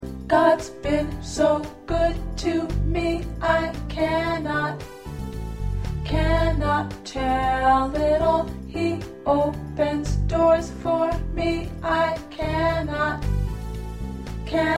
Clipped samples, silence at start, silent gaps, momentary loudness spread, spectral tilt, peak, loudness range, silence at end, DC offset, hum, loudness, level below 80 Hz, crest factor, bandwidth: under 0.1%; 0 s; none; 11 LU; -6.5 dB/octave; -6 dBFS; 3 LU; 0 s; under 0.1%; none; -24 LUFS; -32 dBFS; 18 dB; 14 kHz